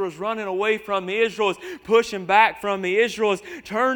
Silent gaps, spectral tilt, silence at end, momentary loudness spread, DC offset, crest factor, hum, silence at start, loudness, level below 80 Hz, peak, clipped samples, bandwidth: none; -4 dB/octave; 0 s; 10 LU; under 0.1%; 20 dB; none; 0 s; -22 LUFS; -62 dBFS; -2 dBFS; under 0.1%; 19 kHz